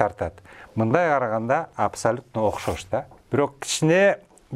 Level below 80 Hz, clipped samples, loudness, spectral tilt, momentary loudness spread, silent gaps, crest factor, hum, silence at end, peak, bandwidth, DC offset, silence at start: -52 dBFS; under 0.1%; -23 LUFS; -5 dB/octave; 11 LU; none; 22 dB; none; 0 s; -2 dBFS; 15.5 kHz; under 0.1%; 0 s